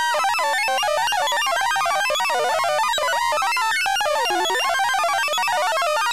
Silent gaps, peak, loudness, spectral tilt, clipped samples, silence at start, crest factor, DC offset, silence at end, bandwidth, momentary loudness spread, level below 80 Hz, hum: none; -12 dBFS; -20 LUFS; 0.5 dB/octave; under 0.1%; 0 s; 8 dB; 0.5%; 0 s; 15.5 kHz; 1 LU; -60 dBFS; none